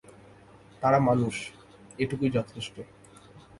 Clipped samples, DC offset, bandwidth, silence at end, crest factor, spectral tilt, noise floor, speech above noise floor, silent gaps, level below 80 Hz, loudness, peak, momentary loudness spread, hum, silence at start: under 0.1%; under 0.1%; 11.5 kHz; 0.2 s; 20 dB; -6.5 dB/octave; -53 dBFS; 27 dB; none; -60 dBFS; -28 LUFS; -10 dBFS; 22 LU; none; 0.8 s